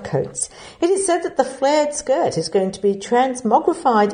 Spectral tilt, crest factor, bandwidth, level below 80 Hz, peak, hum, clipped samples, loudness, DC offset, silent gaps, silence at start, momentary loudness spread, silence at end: -4.5 dB/octave; 18 dB; 9.8 kHz; -56 dBFS; 0 dBFS; none; under 0.1%; -19 LUFS; under 0.1%; none; 0 s; 6 LU; 0 s